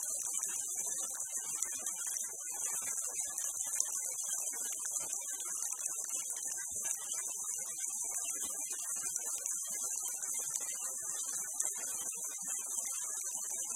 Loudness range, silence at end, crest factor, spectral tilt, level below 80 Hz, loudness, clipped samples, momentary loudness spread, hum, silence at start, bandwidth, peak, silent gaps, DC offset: 1 LU; 0 s; 28 dB; 2 dB/octave; -80 dBFS; -36 LUFS; under 0.1%; 2 LU; none; 0 s; 16.5 kHz; -12 dBFS; none; under 0.1%